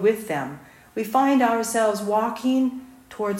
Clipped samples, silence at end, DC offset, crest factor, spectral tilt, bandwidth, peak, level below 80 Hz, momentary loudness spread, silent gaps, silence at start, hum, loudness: under 0.1%; 0 s; under 0.1%; 14 dB; -4.5 dB/octave; 16 kHz; -8 dBFS; -64 dBFS; 16 LU; none; 0 s; none; -22 LUFS